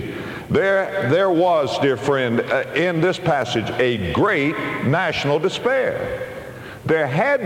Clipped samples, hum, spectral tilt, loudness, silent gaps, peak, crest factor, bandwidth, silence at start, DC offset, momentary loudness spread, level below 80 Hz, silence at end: under 0.1%; none; -6 dB/octave; -19 LUFS; none; -6 dBFS; 14 dB; 16.5 kHz; 0 s; under 0.1%; 10 LU; -50 dBFS; 0 s